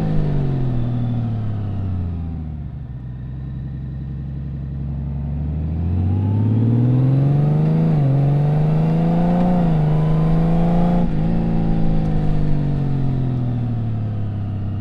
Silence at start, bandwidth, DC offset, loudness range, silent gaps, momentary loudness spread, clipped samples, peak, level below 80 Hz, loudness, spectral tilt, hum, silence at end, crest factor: 0 s; 5 kHz; under 0.1%; 10 LU; none; 12 LU; under 0.1%; -6 dBFS; -26 dBFS; -20 LUFS; -11 dB/octave; none; 0 s; 12 dB